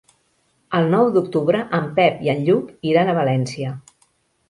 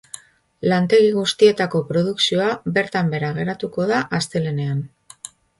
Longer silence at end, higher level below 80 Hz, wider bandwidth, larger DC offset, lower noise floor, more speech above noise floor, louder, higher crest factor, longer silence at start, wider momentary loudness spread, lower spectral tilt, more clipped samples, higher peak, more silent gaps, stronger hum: about the same, 0.7 s vs 0.75 s; about the same, -60 dBFS vs -58 dBFS; about the same, 11.5 kHz vs 11.5 kHz; neither; first, -64 dBFS vs -42 dBFS; first, 46 dB vs 23 dB; about the same, -19 LUFS vs -19 LUFS; about the same, 18 dB vs 18 dB; about the same, 0.7 s vs 0.65 s; second, 9 LU vs 21 LU; first, -7 dB/octave vs -5.5 dB/octave; neither; about the same, -2 dBFS vs -2 dBFS; neither; neither